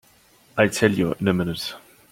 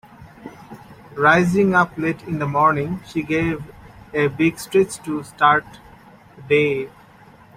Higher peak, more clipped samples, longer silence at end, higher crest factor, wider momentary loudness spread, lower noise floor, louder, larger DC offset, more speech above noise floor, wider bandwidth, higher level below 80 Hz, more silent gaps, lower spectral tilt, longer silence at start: about the same, -2 dBFS vs -2 dBFS; neither; second, 0.35 s vs 0.7 s; about the same, 22 dB vs 18 dB; second, 13 LU vs 20 LU; first, -56 dBFS vs -47 dBFS; second, -22 LUFS vs -19 LUFS; neither; first, 35 dB vs 28 dB; about the same, 16.5 kHz vs 16 kHz; about the same, -54 dBFS vs -52 dBFS; neither; about the same, -5.5 dB/octave vs -6 dB/octave; first, 0.55 s vs 0.2 s